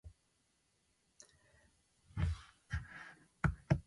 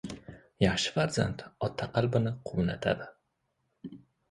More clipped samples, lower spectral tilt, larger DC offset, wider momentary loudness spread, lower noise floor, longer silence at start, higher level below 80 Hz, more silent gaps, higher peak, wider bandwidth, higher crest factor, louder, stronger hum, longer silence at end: neither; first, -7 dB/octave vs -5.5 dB/octave; neither; first, 23 LU vs 20 LU; about the same, -78 dBFS vs -78 dBFS; about the same, 0.05 s vs 0.05 s; about the same, -50 dBFS vs -52 dBFS; neither; second, -18 dBFS vs -10 dBFS; about the same, 11.5 kHz vs 11.5 kHz; about the same, 26 dB vs 22 dB; second, -42 LUFS vs -31 LUFS; neither; second, 0.05 s vs 0.35 s